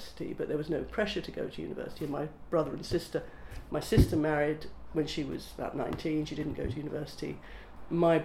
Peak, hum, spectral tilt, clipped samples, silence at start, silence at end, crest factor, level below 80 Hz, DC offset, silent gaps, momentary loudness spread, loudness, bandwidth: -10 dBFS; none; -6.5 dB/octave; under 0.1%; 0 s; 0 s; 22 dB; -44 dBFS; under 0.1%; none; 13 LU; -33 LUFS; 16 kHz